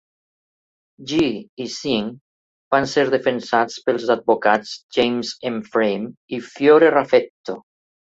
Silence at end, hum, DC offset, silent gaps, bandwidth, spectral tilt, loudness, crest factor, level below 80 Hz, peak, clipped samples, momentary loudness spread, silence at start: 0.55 s; none; under 0.1%; 1.49-1.57 s, 2.21-2.71 s, 4.83-4.89 s, 6.17-6.28 s, 7.30-7.44 s; 8 kHz; -4.5 dB/octave; -19 LUFS; 18 dB; -60 dBFS; -2 dBFS; under 0.1%; 16 LU; 1 s